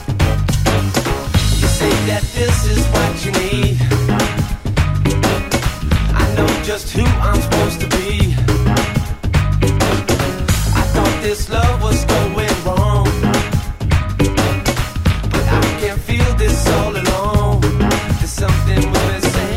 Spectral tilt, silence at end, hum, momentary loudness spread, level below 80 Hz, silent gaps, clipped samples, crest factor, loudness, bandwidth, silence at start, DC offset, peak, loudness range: -5 dB/octave; 0 s; none; 3 LU; -20 dBFS; none; under 0.1%; 14 dB; -16 LUFS; 16.5 kHz; 0 s; under 0.1%; -2 dBFS; 1 LU